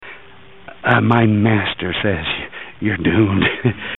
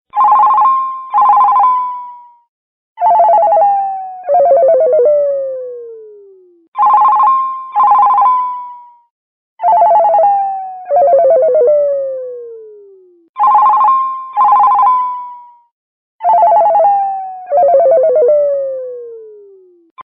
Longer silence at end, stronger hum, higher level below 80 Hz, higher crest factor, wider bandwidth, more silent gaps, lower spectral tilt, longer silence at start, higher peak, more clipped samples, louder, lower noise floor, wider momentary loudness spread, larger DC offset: about the same, 0.05 s vs 0.05 s; neither; first, -44 dBFS vs -70 dBFS; first, 18 dB vs 10 dB; second, 4.1 kHz vs 5.2 kHz; second, none vs 2.49-2.96 s, 6.68-6.72 s, 9.10-9.57 s, 13.29-13.34 s, 15.71-16.19 s, 19.91-19.96 s; about the same, -9 dB/octave vs -9 dB/octave; second, 0 s vs 0.15 s; about the same, 0 dBFS vs -2 dBFS; neither; second, -17 LUFS vs -10 LUFS; about the same, -44 dBFS vs -43 dBFS; second, 10 LU vs 16 LU; first, 0.7% vs under 0.1%